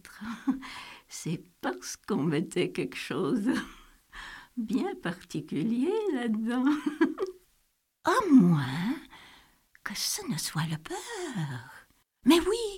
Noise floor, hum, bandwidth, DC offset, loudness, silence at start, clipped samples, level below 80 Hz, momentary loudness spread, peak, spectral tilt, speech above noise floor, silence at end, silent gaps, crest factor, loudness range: -73 dBFS; none; 16.5 kHz; under 0.1%; -29 LUFS; 0.05 s; under 0.1%; -60 dBFS; 18 LU; -10 dBFS; -5 dB/octave; 45 dB; 0 s; none; 20 dB; 6 LU